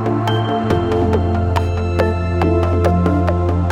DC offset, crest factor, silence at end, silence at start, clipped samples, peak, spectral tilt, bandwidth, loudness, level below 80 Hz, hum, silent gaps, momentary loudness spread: under 0.1%; 14 dB; 0 s; 0 s; under 0.1%; -2 dBFS; -8 dB/octave; 8.4 kHz; -17 LUFS; -28 dBFS; none; none; 2 LU